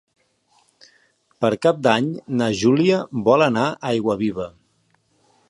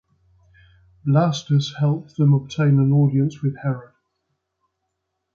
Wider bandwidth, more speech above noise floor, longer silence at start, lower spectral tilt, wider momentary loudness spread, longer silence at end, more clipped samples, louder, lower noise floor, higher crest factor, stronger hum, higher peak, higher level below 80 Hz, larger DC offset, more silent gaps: first, 11.5 kHz vs 7 kHz; second, 45 dB vs 58 dB; first, 1.4 s vs 1.05 s; second, -6 dB/octave vs -8 dB/octave; second, 7 LU vs 10 LU; second, 1 s vs 1.55 s; neither; about the same, -19 LUFS vs -20 LUFS; second, -64 dBFS vs -77 dBFS; about the same, 20 dB vs 16 dB; neither; first, -2 dBFS vs -6 dBFS; about the same, -58 dBFS vs -60 dBFS; neither; neither